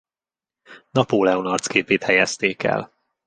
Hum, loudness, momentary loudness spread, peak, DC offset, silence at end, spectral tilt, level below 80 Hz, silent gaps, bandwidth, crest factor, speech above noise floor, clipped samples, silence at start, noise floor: none; -20 LUFS; 6 LU; -2 dBFS; under 0.1%; 0.4 s; -4 dB/octave; -60 dBFS; none; 10 kHz; 20 dB; over 70 dB; under 0.1%; 0.7 s; under -90 dBFS